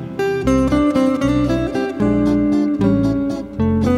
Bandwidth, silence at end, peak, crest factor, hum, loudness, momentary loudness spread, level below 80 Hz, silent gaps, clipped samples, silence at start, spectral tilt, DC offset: 11.5 kHz; 0 s; -4 dBFS; 12 dB; none; -17 LUFS; 5 LU; -32 dBFS; none; under 0.1%; 0 s; -7.5 dB/octave; under 0.1%